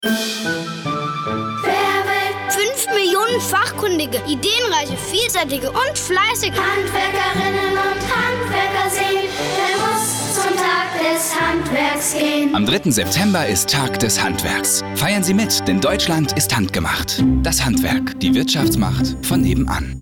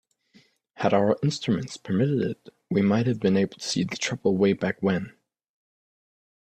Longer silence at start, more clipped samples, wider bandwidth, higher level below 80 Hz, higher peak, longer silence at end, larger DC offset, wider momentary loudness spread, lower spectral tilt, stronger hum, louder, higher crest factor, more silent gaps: second, 0 s vs 0.8 s; neither; first, 19.5 kHz vs 9.4 kHz; first, -36 dBFS vs -64 dBFS; about the same, -6 dBFS vs -6 dBFS; second, 0 s vs 1.5 s; neither; second, 4 LU vs 7 LU; second, -3.5 dB/octave vs -6 dB/octave; neither; first, -17 LUFS vs -25 LUFS; second, 12 dB vs 20 dB; neither